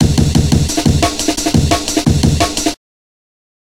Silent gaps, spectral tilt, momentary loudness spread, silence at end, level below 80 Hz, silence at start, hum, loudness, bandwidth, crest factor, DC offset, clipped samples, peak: none; -5 dB/octave; 4 LU; 1 s; -24 dBFS; 0 s; none; -13 LUFS; 16.5 kHz; 14 dB; 1%; under 0.1%; 0 dBFS